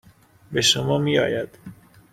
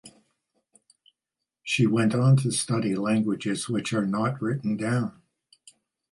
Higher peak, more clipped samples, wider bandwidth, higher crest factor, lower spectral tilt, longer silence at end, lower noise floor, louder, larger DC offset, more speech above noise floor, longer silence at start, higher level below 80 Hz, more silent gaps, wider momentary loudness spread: first, -4 dBFS vs -10 dBFS; neither; first, 15.5 kHz vs 11.5 kHz; about the same, 20 dB vs 16 dB; second, -3.5 dB/octave vs -5.5 dB/octave; second, 0.4 s vs 1 s; second, -48 dBFS vs -87 dBFS; first, -21 LUFS vs -25 LUFS; neither; second, 27 dB vs 63 dB; first, 0.5 s vs 0.05 s; first, -56 dBFS vs -66 dBFS; neither; first, 11 LU vs 8 LU